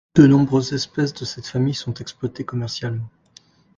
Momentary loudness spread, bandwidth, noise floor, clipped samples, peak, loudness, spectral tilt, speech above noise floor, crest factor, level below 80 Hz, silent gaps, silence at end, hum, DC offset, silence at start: 16 LU; 7.6 kHz; -53 dBFS; under 0.1%; 0 dBFS; -21 LUFS; -6.5 dB/octave; 33 dB; 20 dB; -52 dBFS; none; 0.7 s; none; under 0.1%; 0.15 s